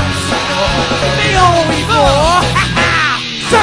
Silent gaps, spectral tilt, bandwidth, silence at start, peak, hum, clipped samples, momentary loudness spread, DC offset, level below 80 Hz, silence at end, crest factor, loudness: none; -4 dB/octave; 11 kHz; 0 s; 0 dBFS; none; under 0.1%; 5 LU; under 0.1%; -26 dBFS; 0 s; 12 dB; -11 LUFS